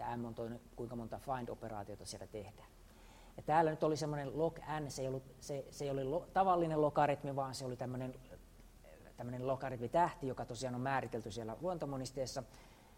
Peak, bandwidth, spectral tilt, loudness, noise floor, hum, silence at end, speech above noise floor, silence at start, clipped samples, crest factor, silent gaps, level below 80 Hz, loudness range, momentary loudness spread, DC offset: -18 dBFS; 16 kHz; -6 dB/octave; -39 LUFS; -59 dBFS; none; 0.05 s; 20 dB; 0 s; under 0.1%; 22 dB; none; -62 dBFS; 4 LU; 15 LU; under 0.1%